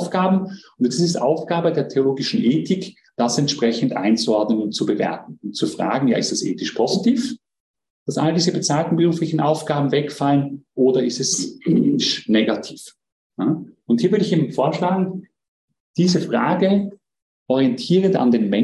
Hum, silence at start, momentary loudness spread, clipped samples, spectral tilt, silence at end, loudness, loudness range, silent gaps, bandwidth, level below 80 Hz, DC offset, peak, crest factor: none; 0 s; 9 LU; under 0.1%; -5.5 dB/octave; 0 s; -20 LUFS; 2 LU; 7.60-7.74 s, 7.90-8.06 s, 13.12-13.30 s, 15.48-15.68 s, 15.80-15.94 s, 17.22-17.46 s; 12 kHz; -64 dBFS; under 0.1%; -4 dBFS; 14 dB